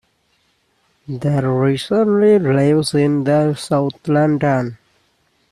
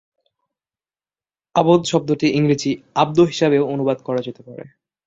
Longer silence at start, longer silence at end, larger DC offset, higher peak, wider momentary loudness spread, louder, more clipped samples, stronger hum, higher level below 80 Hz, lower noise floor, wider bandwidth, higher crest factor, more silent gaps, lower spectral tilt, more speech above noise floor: second, 1.1 s vs 1.55 s; first, 0.75 s vs 0.4 s; neither; about the same, -4 dBFS vs -2 dBFS; second, 7 LU vs 15 LU; about the same, -16 LUFS vs -18 LUFS; neither; neither; about the same, -54 dBFS vs -58 dBFS; second, -62 dBFS vs under -90 dBFS; first, 13 kHz vs 7.8 kHz; about the same, 14 dB vs 18 dB; neither; about the same, -7 dB/octave vs -6 dB/octave; second, 47 dB vs over 72 dB